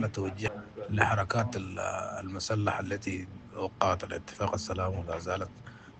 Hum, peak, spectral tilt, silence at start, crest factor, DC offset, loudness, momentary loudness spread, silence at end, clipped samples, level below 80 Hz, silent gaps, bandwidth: none; -8 dBFS; -5.5 dB/octave; 0 s; 24 dB; under 0.1%; -33 LUFS; 11 LU; 0 s; under 0.1%; -58 dBFS; none; 8.8 kHz